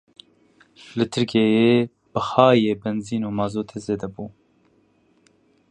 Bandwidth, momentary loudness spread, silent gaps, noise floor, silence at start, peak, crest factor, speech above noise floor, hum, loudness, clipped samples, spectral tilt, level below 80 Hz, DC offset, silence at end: 9.8 kHz; 15 LU; none; -61 dBFS; 0.9 s; -2 dBFS; 22 dB; 41 dB; none; -21 LUFS; under 0.1%; -6.5 dB/octave; -58 dBFS; under 0.1%; 1.4 s